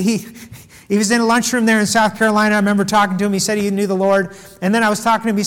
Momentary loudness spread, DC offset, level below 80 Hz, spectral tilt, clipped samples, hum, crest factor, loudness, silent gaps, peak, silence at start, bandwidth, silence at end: 6 LU; under 0.1%; -54 dBFS; -4 dB/octave; under 0.1%; none; 12 dB; -15 LUFS; none; -4 dBFS; 0 s; 17 kHz; 0 s